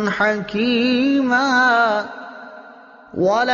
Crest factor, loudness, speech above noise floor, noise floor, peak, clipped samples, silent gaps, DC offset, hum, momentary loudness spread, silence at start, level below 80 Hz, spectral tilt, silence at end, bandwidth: 14 dB; -17 LUFS; 26 dB; -43 dBFS; -6 dBFS; under 0.1%; none; under 0.1%; none; 20 LU; 0 s; -58 dBFS; -2.5 dB/octave; 0 s; 7.2 kHz